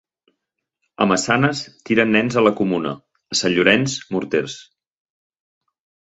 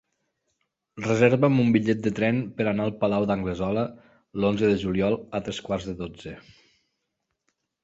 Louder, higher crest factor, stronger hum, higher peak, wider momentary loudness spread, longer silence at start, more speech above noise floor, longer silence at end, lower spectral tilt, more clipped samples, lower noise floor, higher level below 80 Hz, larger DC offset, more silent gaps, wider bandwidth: first, -18 LUFS vs -25 LUFS; about the same, 20 dB vs 20 dB; neither; first, 0 dBFS vs -6 dBFS; about the same, 13 LU vs 14 LU; about the same, 1 s vs 0.95 s; first, 60 dB vs 56 dB; about the same, 1.55 s vs 1.45 s; second, -4.5 dB/octave vs -7 dB/octave; neither; about the same, -79 dBFS vs -80 dBFS; second, -58 dBFS vs -52 dBFS; neither; neither; about the same, 8.2 kHz vs 8 kHz